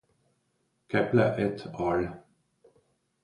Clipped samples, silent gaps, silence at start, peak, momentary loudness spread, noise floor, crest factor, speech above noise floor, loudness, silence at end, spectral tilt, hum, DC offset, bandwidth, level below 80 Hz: under 0.1%; none; 0.9 s; -10 dBFS; 8 LU; -75 dBFS; 22 dB; 48 dB; -28 LUFS; 1.05 s; -8 dB/octave; none; under 0.1%; 11 kHz; -58 dBFS